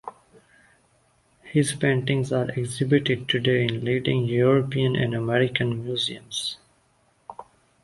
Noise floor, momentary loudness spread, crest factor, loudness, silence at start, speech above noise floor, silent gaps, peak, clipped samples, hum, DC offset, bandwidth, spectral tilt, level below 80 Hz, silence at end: -64 dBFS; 9 LU; 18 dB; -24 LUFS; 0.05 s; 41 dB; none; -6 dBFS; under 0.1%; none; under 0.1%; 11.5 kHz; -5.5 dB/octave; -58 dBFS; 0.4 s